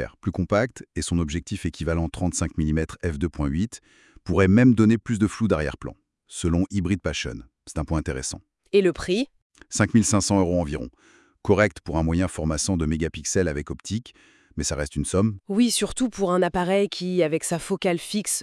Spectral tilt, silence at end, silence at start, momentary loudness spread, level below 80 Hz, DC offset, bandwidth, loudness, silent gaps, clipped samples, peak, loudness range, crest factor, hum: -5 dB/octave; 0 s; 0 s; 12 LU; -42 dBFS; under 0.1%; 12 kHz; -24 LUFS; 9.42-9.50 s; under 0.1%; -4 dBFS; 4 LU; 18 dB; none